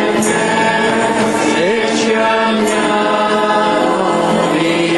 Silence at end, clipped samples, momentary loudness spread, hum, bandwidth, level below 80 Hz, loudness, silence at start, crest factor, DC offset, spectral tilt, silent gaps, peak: 0 s; under 0.1%; 1 LU; none; 12 kHz; -50 dBFS; -13 LUFS; 0 s; 12 dB; under 0.1%; -4 dB/octave; none; -2 dBFS